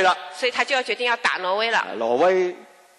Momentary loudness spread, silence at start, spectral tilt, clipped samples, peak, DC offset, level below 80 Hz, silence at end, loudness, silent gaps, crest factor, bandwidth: 5 LU; 0 s; -2.5 dB/octave; under 0.1%; -8 dBFS; under 0.1%; -72 dBFS; 0.35 s; -21 LUFS; none; 16 dB; 12 kHz